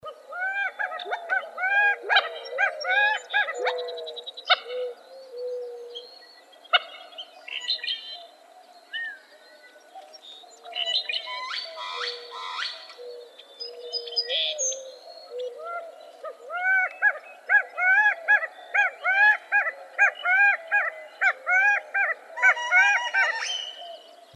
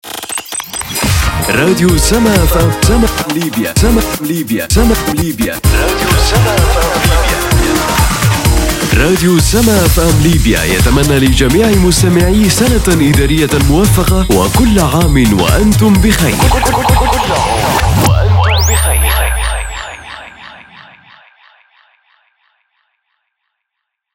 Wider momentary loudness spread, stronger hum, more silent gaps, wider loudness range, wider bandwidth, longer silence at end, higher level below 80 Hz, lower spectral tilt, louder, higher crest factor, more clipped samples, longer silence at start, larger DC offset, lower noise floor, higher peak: first, 21 LU vs 6 LU; neither; neither; first, 11 LU vs 3 LU; second, 12.5 kHz vs 16.5 kHz; second, 0.2 s vs 3.55 s; second, under -90 dBFS vs -16 dBFS; second, 3.5 dB/octave vs -4.5 dB/octave; second, -24 LUFS vs -10 LUFS; first, 22 dB vs 10 dB; neither; about the same, 0.05 s vs 0.05 s; neither; second, -51 dBFS vs -74 dBFS; second, -4 dBFS vs 0 dBFS